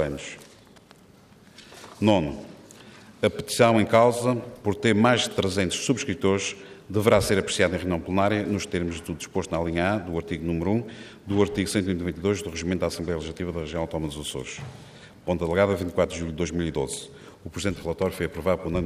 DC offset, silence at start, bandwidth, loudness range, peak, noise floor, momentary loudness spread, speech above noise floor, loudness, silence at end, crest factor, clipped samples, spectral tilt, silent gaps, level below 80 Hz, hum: under 0.1%; 0 s; 15.5 kHz; 6 LU; -6 dBFS; -53 dBFS; 16 LU; 28 dB; -25 LUFS; 0 s; 20 dB; under 0.1%; -5 dB/octave; none; -50 dBFS; none